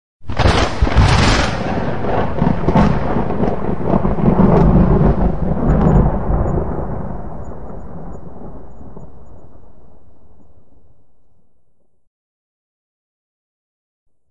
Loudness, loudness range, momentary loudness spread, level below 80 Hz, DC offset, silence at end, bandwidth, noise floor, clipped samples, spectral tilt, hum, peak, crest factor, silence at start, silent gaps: -16 LUFS; 20 LU; 21 LU; -24 dBFS; 7%; 0 s; 10.5 kHz; -59 dBFS; under 0.1%; -7 dB/octave; none; 0 dBFS; 16 dB; 0.2 s; 12.07-14.06 s